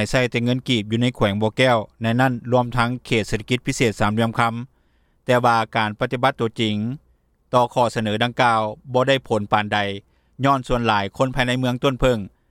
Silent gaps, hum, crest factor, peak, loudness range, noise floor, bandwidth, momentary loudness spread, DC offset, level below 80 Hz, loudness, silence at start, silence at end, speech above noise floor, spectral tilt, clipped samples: none; none; 18 dB; -4 dBFS; 1 LU; -61 dBFS; 14.5 kHz; 5 LU; under 0.1%; -40 dBFS; -20 LUFS; 0 s; 0.2 s; 41 dB; -5.5 dB/octave; under 0.1%